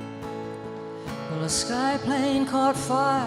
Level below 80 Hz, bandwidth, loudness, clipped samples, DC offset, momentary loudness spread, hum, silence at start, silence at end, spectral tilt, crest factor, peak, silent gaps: -54 dBFS; 15 kHz; -26 LUFS; under 0.1%; under 0.1%; 13 LU; none; 0 s; 0 s; -4 dB/octave; 14 dB; -12 dBFS; none